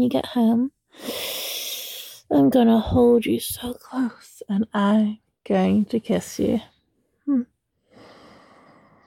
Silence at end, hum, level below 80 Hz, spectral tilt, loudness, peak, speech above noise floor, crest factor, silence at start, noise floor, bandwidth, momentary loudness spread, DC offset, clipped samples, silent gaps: 1.65 s; none; -48 dBFS; -5.5 dB/octave; -22 LUFS; -6 dBFS; 48 dB; 16 dB; 0 s; -68 dBFS; 17.5 kHz; 15 LU; under 0.1%; under 0.1%; none